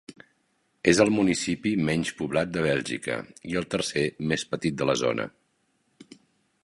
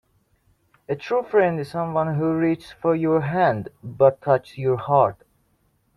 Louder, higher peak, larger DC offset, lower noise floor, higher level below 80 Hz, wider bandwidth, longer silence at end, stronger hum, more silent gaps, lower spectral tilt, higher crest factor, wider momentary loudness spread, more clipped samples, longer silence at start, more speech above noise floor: second, -26 LUFS vs -22 LUFS; about the same, -4 dBFS vs -4 dBFS; neither; first, -71 dBFS vs -66 dBFS; about the same, -56 dBFS vs -58 dBFS; about the same, 11.5 kHz vs 11.5 kHz; second, 0.65 s vs 0.85 s; neither; neither; second, -4.5 dB/octave vs -8.5 dB/octave; first, 24 dB vs 18 dB; first, 10 LU vs 7 LU; neither; second, 0.1 s vs 0.9 s; about the same, 45 dB vs 45 dB